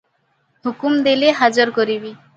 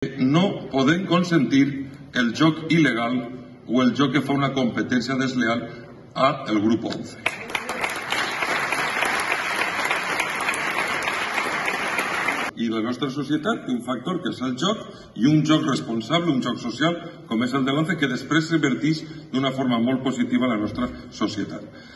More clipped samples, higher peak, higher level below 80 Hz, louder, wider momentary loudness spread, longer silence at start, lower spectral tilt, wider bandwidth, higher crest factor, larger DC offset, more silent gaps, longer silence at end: neither; first, 0 dBFS vs -4 dBFS; second, -68 dBFS vs -58 dBFS; first, -17 LUFS vs -23 LUFS; first, 12 LU vs 8 LU; first, 0.65 s vs 0 s; about the same, -4 dB/octave vs -5 dB/octave; second, 9 kHz vs 12.5 kHz; about the same, 18 dB vs 18 dB; neither; neither; first, 0.2 s vs 0 s